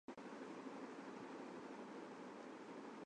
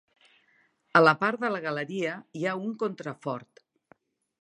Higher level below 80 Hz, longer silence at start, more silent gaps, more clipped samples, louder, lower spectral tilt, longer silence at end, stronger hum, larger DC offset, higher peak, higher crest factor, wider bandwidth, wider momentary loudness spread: second, under -90 dBFS vs -80 dBFS; second, 0.1 s vs 0.95 s; neither; neither; second, -54 LUFS vs -27 LUFS; about the same, -5 dB/octave vs -6 dB/octave; second, 0 s vs 1 s; neither; neither; second, -40 dBFS vs -6 dBFS; second, 14 dB vs 24 dB; about the same, 10 kHz vs 10 kHz; second, 2 LU vs 15 LU